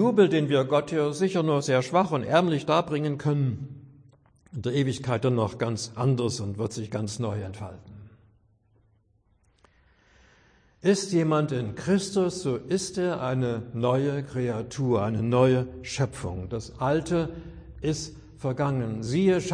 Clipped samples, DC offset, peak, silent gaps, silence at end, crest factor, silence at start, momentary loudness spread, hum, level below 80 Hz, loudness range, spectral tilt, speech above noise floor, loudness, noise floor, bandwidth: under 0.1%; under 0.1%; -8 dBFS; none; 0 s; 18 dB; 0 s; 11 LU; none; -54 dBFS; 8 LU; -6 dB/octave; 40 dB; -26 LUFS; -66 dBFS; 10.5 kHz